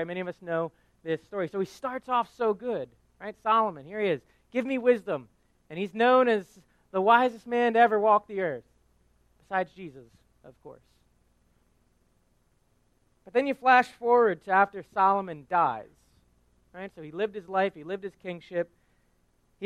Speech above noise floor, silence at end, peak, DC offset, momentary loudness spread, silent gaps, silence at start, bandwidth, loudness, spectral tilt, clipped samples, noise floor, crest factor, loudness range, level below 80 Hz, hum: 41 dB; 0 s; -8 dBFS; under 0.1%; 17 LU; none; 0 s; 11 kHz; -27 LUFS; -6 dB/octave; under 0.1%; -68 dBFS; 22 dB; 13 LU; -68 dBFS; none